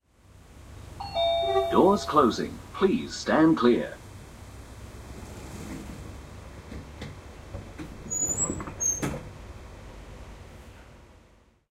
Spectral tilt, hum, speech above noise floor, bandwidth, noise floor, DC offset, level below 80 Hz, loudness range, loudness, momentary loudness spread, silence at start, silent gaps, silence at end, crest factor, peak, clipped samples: -4 dB/octave; none; 36 dB; 16 kHz; -59 dBFS; under 0.1%; -48 dBFS; 18 LU; -25 LUFS; 24 LU; 0.35 s; none; 0.65 s; 22 dB; -6 dBFS; under 0.1%